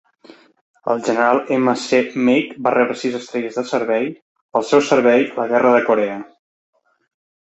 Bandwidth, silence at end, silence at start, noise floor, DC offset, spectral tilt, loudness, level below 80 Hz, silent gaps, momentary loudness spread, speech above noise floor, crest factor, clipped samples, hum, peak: 8.2 kHz; 1.3 s; 0.85 s; -47 dBFS; under 0.1%; -5 dB/octave; -17 LUFS; -66 dBFS; 4.22-4.35 s, 4.41-4.49 s; 10 LU; 30 dB; 16 dB; under 0.1%; none; -2 dBFS